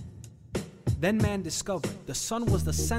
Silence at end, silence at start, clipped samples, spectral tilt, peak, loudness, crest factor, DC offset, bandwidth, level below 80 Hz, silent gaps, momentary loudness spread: 0 s; 0 s; under 0.1%; -5 dB/octave; -14 dBFS; -30 LUFS; 16 dB; under 0.1%; 16 kHz; -40 dBFS; none; 11 LU